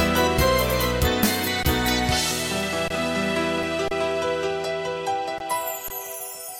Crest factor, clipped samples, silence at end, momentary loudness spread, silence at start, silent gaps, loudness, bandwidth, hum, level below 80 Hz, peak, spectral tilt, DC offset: 16 dB; under 0.1%; 0 s; 8 LU; 0 s; none; -23 LUFS; 17 kHz; none; -36 dBFS; -8 dBFS; -3.5 dB/octave; under 0.1%